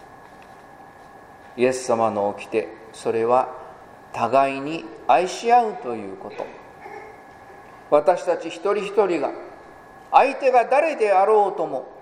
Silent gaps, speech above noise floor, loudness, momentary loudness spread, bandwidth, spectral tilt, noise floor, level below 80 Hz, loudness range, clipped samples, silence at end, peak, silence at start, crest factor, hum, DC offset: none; 24 dB; -21 LUFS; 21 LU; 12 kHz; -4.5 dB/octave; -45 dBFS; -64 dBFS; 4 LU; under 0.1%; 0 s; 0 dBFS; 0.1 s; 22 dB; none; under 0.1%